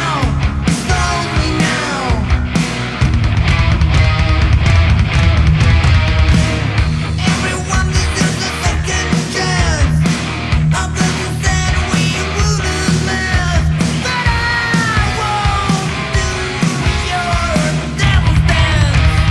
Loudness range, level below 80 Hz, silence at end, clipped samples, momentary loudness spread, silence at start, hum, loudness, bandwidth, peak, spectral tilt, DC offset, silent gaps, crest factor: 3 LU; -20 dBFS; 0 s; under 0.1%; 4 LU; 0 s; none; -14 LUFS; 12 kHz; 0 dBFS; -5 dB/octave; under 0.1%; none; 12 dB